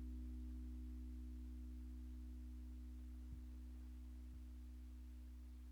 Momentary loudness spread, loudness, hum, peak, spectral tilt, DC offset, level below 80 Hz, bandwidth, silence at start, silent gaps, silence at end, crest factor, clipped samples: 5 LU; -55 LUFS; none; -44 dBFS; -7.5 dB/octave; under 0.1%; -52 dBFS; 15 kHz; 0 s; none; 0 s; 8 dB; under 0.1%